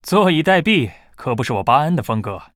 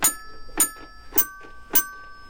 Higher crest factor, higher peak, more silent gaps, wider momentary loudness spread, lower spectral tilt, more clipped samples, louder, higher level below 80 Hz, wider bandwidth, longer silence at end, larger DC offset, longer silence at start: about the same, 16 dB vs 20 dB; first, -2 dBFS vs -6 dBFS; neither; second, 10 LU vs 15 LU; first, -6 dB/octave vs 0 dB/octave; neither; first, -17 LUFS vs -22 LUFS; about the same, -50 dBFS vs -46 dBFS; about the same, 16 kHz vs 17 kHz; first, 0.15 s vs 0 s; second, under 0.1% vs 0.4%; about the same, 0.05 s vs 0 s